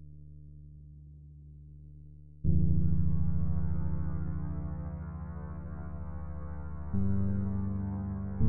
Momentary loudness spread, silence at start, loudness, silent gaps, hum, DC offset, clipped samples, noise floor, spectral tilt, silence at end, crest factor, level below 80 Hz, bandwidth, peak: 22 LU; 0 s; -35 LUFS; none; none; under 0.1%; under 0.1%; -52 dBFS; -14.5 dB/octave; 0 s; 18 dB; -42 dBFS; 2.3 kHz; -14 dBFS